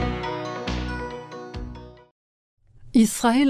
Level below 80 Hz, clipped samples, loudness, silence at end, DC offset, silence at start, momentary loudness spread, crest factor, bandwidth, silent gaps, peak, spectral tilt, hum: -38 dBFS; under 0.1%; -25 LUFS; 0 s; under 0.1%; 0 s; 17 LU; 18 dB; 16 kHz; 2.11-2.57 s; -8 dBFS; -5 dB/octave; none